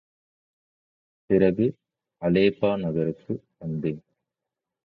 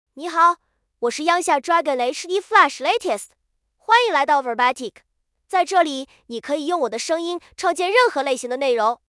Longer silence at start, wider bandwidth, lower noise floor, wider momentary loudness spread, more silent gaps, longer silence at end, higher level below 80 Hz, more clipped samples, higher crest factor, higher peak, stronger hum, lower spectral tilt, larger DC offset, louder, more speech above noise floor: first, 1.3 s vs 0.15 s; second, 5 kHz vs 12 kHz; first, -87 dBFS vs -66 dBFS; about the same, 13 LU vs 12 LU; neither; first, 0.85 s vs 0.2 s; first, -56 dBFS vs -70 dBFS; neither; about the same, 20 dB vs 20 dB; second, -6 dBFS vs 0 dBFS; neither; first, -10 dB/octave vs -1 dB/octave; neither; second, -25 LUFS vs -20 LUFS; first, 64 dB vs 46 dB